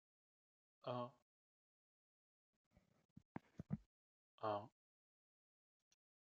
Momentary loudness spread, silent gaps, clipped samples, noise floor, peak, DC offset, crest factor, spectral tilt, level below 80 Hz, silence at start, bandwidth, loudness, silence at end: 13 LU; 1.22-2.71 s, 3.05-3.16 s, 3.25-3.35 s, 3.86-4.38 s; under 0.1%; under -90 dBFS; -32 dBFS; under 0.1%; 24 dB; -6 dB/octave; -82 dBFS; 0.85 s; 7 kHz; -51 LUFS; 1.65 s